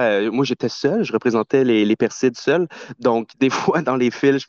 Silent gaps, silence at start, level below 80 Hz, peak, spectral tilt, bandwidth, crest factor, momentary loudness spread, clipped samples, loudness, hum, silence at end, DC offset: none; 0 s; -64 dBFS; -4 dBFS; -5.5 dB/octave; 7.4 kHz; 14 dB; 4 LU; under 0.1%; -19 LUFS; none; 0.05 s; under 0.1%